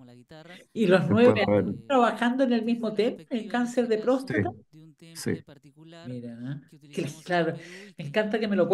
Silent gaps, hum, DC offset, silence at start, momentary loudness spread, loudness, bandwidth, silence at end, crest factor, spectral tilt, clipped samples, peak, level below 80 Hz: none; none; under 0.1%; 0 s; 19 LU; -26 LUFS; 12.5 kHz; 0 s; 20 dB; -6.5 dB/octave; under 0.1%; -6 dBFS; -68 dBFS